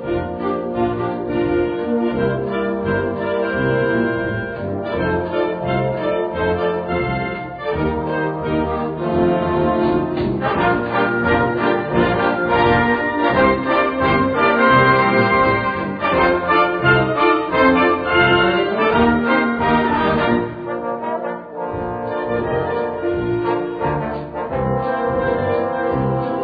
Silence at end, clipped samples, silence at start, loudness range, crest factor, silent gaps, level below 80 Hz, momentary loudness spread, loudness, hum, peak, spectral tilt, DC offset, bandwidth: 0 s; under 0.1%; 0 s; 6 LU; 16 dB; none; -40 dBFS; 9 LU; -18 LUFS; none; -2 dBFS; -9.5 dB/octave; under 0.1%; 5 kHz